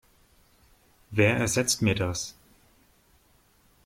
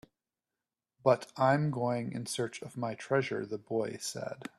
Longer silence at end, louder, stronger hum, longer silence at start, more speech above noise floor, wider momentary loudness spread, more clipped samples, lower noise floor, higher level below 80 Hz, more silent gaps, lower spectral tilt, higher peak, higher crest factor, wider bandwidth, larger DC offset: first, 1.55 s vs 0.1 s; first, -26 LUFS vs -33 LUFS; neither; about the same, 1.1 s vs 1.05 s; second, 38 dB vs over 58 dB; about the same, 11 LU vs 10 LU; neither; second, -63 dBFS vs under -90 dBFS; first, -56 dBFS vs -74 dBFS; neither; second, -4 dB/octave vs -5.5 dB/octave; about the same, -10 dBFS vs -10 dBFS; about the same, 20 dB vs 22 dB; first, 16.5 kHz vs 13 kHz; neither